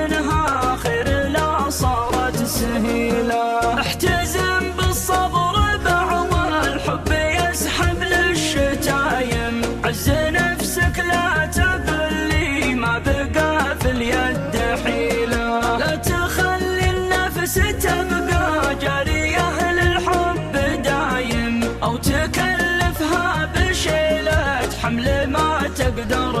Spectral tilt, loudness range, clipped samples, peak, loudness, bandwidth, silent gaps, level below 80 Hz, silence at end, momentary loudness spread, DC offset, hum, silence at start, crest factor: -4.5 dB/octave; 1 LU; under 0.1%; -6 dBFS; -19 LUFS; 15 kHz; none; -30 dBFS; 0 s; 3 LU; under 0.1%; none; 0 s; 14 dB